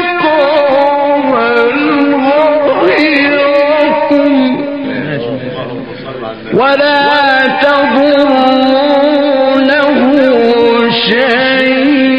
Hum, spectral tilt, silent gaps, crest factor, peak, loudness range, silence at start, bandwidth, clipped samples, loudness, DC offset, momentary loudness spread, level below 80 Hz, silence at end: none; -6.5 dB/octave; none; 10 dB; 0 dBFS; 4 LU; 0 s; 6.2 kHz; 0.4%; -9 LUFS; 0.6%; 9 LU; -52 dBFS; 0 s